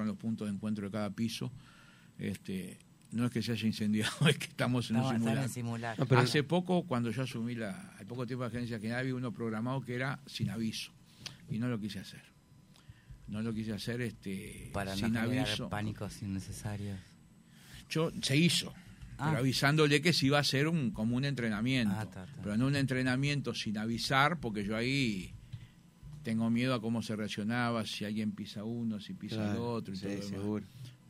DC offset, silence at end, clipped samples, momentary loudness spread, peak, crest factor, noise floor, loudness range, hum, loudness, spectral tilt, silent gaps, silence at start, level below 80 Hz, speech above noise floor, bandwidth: under 0.1%; 0.15 s; under 0.1%; 15 LU; -10 dBFS; 24 dB; -61 dBFS; 9 LU; none; -34 LUFS; -5.5 dB/octave; none; 0 s; -60 dBFS; 27 dB; 16 kHz